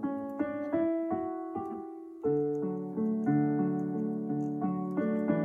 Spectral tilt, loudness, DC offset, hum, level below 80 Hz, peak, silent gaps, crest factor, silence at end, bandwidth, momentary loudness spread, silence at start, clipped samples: -11 dB/octave; -32 LUFS; under 0.1%; none; -72 dBFS; -14 dBFS; none; 16 dB; 0 s; 3.5 kHz; 9 LU; 0 s; under 0.1%